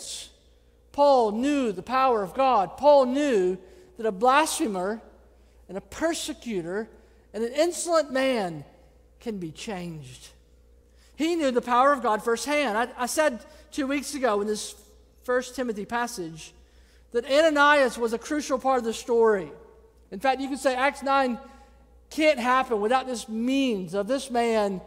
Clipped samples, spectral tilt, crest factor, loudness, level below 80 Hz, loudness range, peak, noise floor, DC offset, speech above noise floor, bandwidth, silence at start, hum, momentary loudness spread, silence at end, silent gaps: under 0.1%; -3.5 dB/octave; 18 dB; -25 LUFS; -56 dBFS; 7 LU; -6 dBFS; -58 dBFS; under 0.1%; 33 dB; 16 kHz; 0 s; none; 16 LU; 0 s; none